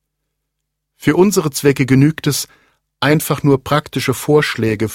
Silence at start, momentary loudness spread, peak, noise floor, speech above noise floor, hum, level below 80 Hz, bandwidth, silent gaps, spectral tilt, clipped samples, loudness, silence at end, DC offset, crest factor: 1 s; 7 LU; 0 dBFS; -75 dBFS; 61 dB; none; -48 dBFS; 16.5 kHz; none; -5.5 dB/octave; under 0.1%; -15 LUFS; 0 s; under 0.1%; 16 dB